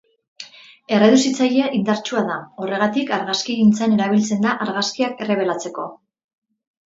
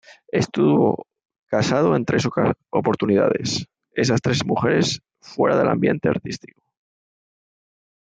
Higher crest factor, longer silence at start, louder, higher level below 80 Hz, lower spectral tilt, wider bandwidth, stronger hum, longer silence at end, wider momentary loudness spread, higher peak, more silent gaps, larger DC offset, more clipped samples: about the same, 18 dB vs 16 dB; about the same, 0.4 s vs 0.35 s; about the same, -19 LUFS vs -21 LUFS; second, -64 dBFS vs -58 dBFS; about the same, -4.5 dB/octave vs -5.5 dB/octave; second, 8 kHz vs 9.4 kHz; neither; second, 0.9 s vs 1.65 s; first, 15 LU vs 9 LU; about the same, -2 dBFS vs -4 dBFS; second, none vs 1.39-1.46 s; neither; neither